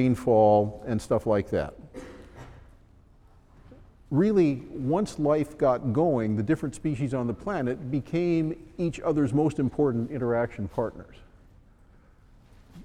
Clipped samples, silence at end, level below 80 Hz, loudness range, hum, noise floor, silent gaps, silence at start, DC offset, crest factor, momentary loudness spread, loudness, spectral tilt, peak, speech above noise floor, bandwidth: under 0.1%; 0 s; -52 dBFS; 6 LU; none; -56 dBFS; none; 0 s; under 0.1%; 18 dB; 10 LU; -26 LUFS; -8 dB/octave; -10 dBFS; 30 dB; 12.5 kHz